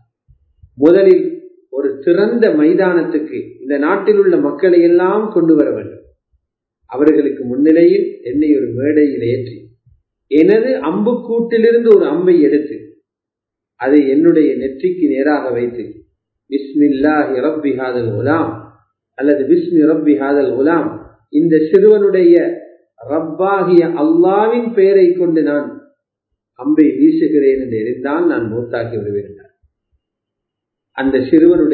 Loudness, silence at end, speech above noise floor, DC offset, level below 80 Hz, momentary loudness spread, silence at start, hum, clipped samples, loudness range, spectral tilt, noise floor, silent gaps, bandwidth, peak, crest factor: -13 LUFS; 0 s; 71 dB; under 0.1%; -54 dBFS; 12 LU; 0.8 s; none; under 0.1%; 4 LU; -10 dB/octave; -83 dBFS; none; 4.5 kHz; 0 dBFS; 14 dB